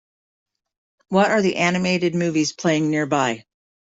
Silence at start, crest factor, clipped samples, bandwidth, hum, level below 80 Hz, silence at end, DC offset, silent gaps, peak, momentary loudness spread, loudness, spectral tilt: 1.1 s; 18 dB; under 0.1%; 8 kHz; none; -62 dBFS; 0.55 s; under 0.1%; none; -4 dBFS; 4 LU; -20 LUFS; -5 dB/octave